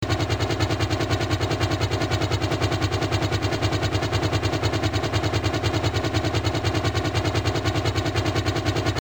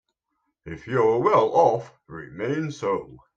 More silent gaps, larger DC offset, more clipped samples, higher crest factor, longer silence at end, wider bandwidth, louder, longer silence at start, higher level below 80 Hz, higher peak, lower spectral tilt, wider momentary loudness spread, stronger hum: neither; first, 0.4% vs under 0.1%; neither; second, 12 dB vs 18 dB; second, 0 s vs 0.2 s; first, 20 kHz vs 7.8 kHz; about the same, -24 LUFS vs -23 LUFS; second, 0 s vs 0.65 s; first, -38 dBFS vs -60 dBFS; second, -10 dBFS vs -6 dBFS; second, -5.5 dB/octave vs -7 dB/octave; second, 1 LU vs 21 LU; neither